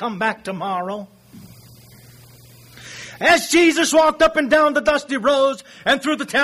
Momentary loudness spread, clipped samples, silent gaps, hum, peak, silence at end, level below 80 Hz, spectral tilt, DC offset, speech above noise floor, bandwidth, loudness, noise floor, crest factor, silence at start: 14 LU; under 0.1%; none; none; -4 dBFS; 0 s; -50 dBFS; -3 dB/octave; under 0.1%; 28 dB; 15.5 kHz; -17 LUFS; -45 dBFS; 14 dB; 0 s